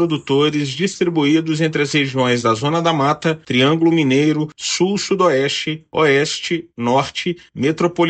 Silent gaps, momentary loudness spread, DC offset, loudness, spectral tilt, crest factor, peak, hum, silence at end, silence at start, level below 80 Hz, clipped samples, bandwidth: none; 7 LU; under 0.1%; -17 LUFS; -5 dB/octave; 14 dB; -2 dBFS; none; 0 s; 0 s; -58 dBFS; under 0.1%; 9 kHz